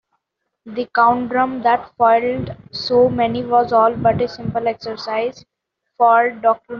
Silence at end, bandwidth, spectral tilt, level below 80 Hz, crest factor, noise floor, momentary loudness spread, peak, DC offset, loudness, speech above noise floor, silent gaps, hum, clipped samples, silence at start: 0 s; 6.6 kHz; -4 dB/octave; -52 dBFS; 16 dB; -75 dBFS; 12 LU; -2 dBFS; under 0.1%; -17 LUFS; 58 dB; none; none; under 0.1%; 0.65 s